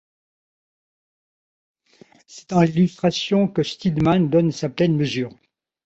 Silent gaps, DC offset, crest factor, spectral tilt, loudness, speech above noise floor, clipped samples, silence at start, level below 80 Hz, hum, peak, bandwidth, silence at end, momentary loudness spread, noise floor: none; under 0.1%; 18 dB; -7 dB/octave; -20 LUFS; 33 dB; under 0.1%; 2.3 s; -54 dBFS; none; -4 dBFS; 8 kHz; 0.55 s; 6 LU; -53 dBFS